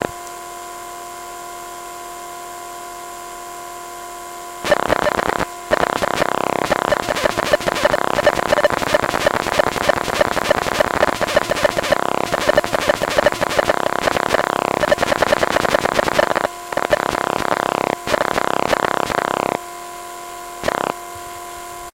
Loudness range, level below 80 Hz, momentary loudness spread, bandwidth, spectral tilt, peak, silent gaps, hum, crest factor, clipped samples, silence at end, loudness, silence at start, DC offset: 9 LU; -42 dBFS; 15 LU; 17 kHz; -3.5 dB/octave; 0 dBFS; none; none; 20 dB; under 0.1%; 0.1 s; -18 LUFS; 0 s; under 0.1%